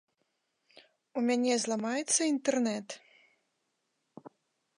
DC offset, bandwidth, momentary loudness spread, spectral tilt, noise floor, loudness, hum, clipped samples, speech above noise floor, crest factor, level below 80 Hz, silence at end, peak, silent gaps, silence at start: under 0.1%; 11.5 kHz; 13 LU; -2.5 dB/octave; -80 dBFS; -30 LUFS; none; under 0.1%; 50 dB; 20 dB; -88 dBFS; 0.5 s; -14 dBFS; none; 1.15 s